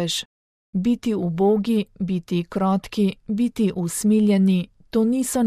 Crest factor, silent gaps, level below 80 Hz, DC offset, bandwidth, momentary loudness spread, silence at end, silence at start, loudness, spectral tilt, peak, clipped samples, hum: 12 dB; 0.25-0.73 s; -54 dBFS; under 0.1%; 14.5 kHz; 8 LU; 0 s; 0 s; -22 LUFS; -6 dB/octave; -10 dBFS; under 0.1%; none